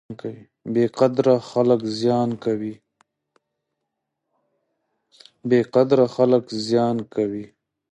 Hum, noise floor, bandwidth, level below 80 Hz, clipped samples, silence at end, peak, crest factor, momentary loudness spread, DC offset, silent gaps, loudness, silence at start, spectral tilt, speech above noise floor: none; -80 dBFS; 10 kHz; -66 dBFS; under 0.1%; 0.45 s; -4 dBFS; 18 dB; 16 LU; under 0.1%; none; -20 LUFS; 0.1 s; -7 dB/octave; 60 dB